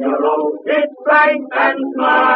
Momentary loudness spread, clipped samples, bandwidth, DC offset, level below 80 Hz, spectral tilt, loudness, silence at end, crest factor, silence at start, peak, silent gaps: 6 LU; under 0.1%; 5.8 kHz; under 0.1%; -86 dBFS; 0 dB/octave; -15 LUFS; 0 s; 14 dB; 0 s; 0 dBFS; none